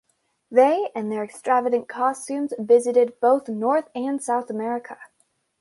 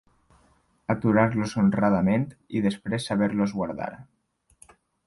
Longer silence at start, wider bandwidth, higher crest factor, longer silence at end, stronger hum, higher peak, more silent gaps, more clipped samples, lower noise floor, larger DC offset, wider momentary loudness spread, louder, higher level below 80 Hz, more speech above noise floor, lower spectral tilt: second, 0.5 s vs 0.9 s; about the same, 11.5 kHz vs 11.5 kHz; about the same, 18 dB vs 18 dB; second, 0.55 s vs 1.05 s; neither; first, -4 dBFS vs -8 dBFS; neither; neither; first, -68 dBFS vs -63 dBFS; neither; about the same, 11 LU vs 10 LU; first, -22 LUFS vs -25 LUFS; second, -76 dBFS vs -56 dBFS; first, 47 dB vs 39 dB; second, -5 dB/octave vs -7 dB/octave